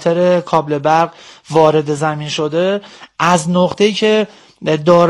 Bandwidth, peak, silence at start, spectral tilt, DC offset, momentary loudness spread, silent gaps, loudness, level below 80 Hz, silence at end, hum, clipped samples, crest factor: 12 kHz; 0 dBFS; 0 s; -5.5 dB/octave; under 0.1%; 8 LU; none; -15 LUFS; -56 dBFS; 0 s; none; 0.4%; 14 dB